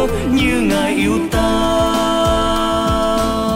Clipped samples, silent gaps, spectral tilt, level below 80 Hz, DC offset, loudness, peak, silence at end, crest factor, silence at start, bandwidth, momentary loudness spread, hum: under 0.1%; none; -5 dB/octave; -26 dBFS; under 0.1%; -16 LUFS; -6 dBFS; 0 s; 10 dB; 0 s; 16.5 kHz; 2 LU; none